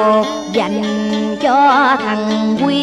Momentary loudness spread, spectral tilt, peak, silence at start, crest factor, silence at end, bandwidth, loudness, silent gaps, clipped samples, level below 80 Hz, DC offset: 7 LU; -5 dB/octave; -2 dBFS; 0 s; 12 dB; 0 s; 10.5 kHz; -14 LUFS; none; under 0.1%; -52 dBFS; under 0.1%